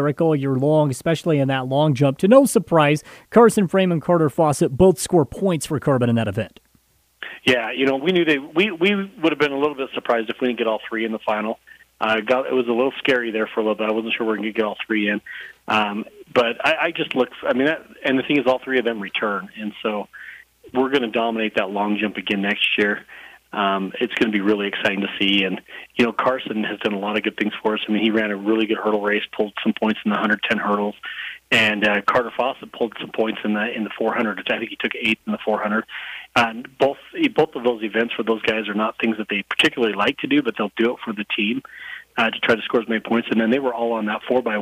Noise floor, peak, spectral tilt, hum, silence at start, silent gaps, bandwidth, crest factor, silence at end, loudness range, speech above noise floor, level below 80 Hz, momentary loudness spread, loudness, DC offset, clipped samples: -60 dBFS; 0 dBFS; -5.5 dB/octave; none; 0 s; none; 15.5 kHz; 20 dB; 0 s; 5 LU; 40 dB; -56 dBFS; 8 LU; -20 LUFS; under 0.1%; under 0.1%